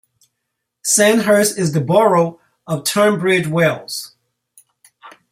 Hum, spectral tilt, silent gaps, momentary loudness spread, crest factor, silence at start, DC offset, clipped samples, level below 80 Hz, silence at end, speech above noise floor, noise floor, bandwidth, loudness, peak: none; -4 dB/octave; none; 13 LU; 16 dB; 0.85 s; under 0.1%; under 0.1%; -60 dBFS; 0.25 s; 61 dB; -76 dBFS; 16 kHz; -15 LUFS; -2 dBFS